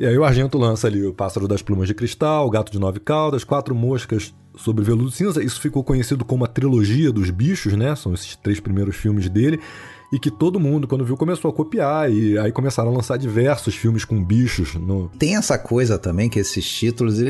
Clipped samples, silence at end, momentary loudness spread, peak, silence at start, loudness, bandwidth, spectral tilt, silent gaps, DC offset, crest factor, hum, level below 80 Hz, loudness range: under 0.1%; 0 s; 6 LU; -4 dBFS; 0 s; -20 LUFS; 12.5 kHz; -6.5 dB/octave; none; under 0.1%; 16 dB; none; -40 dBFS; 2 LU